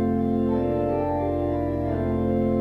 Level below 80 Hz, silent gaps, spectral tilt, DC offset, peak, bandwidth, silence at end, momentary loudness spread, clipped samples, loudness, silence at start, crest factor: -40 dBFS; none; -10.5 dB/octave; under 0.1%; -12 dBFS; 5.2 kHz; 0 s; 2 LU; under 0.1%; -24 LUFS; 0 s; 10 dB